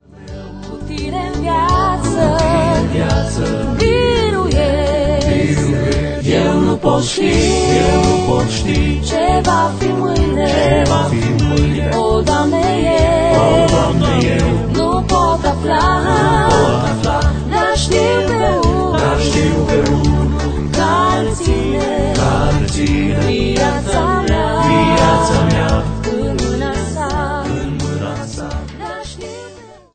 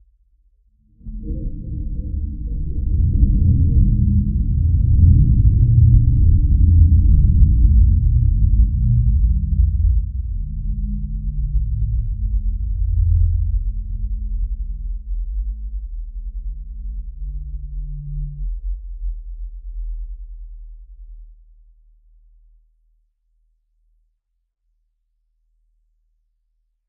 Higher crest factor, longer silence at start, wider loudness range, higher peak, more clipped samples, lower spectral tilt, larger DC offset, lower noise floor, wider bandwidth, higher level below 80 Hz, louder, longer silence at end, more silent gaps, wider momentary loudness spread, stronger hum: about the same, 14 dB vs 18 dB; second, 0.15 s vs 1.05 s; second, 3 LU vs 18 LU; about the same, 0 dBFS vs 0 dBFS; neither; second, -5.5 dB/octave vs -20 dB/octave; neither; second, -37 dBFS vs -72 dBFS; first, 9.2 kHz vs 0.5 kHz; about the same, -22 dBFS vs -20 dBFS; first, -14 LUFS vs -19 LUFS; second, 0.2 s vs 5.6 s; neither; second, 8 LU vs 19 LU; neither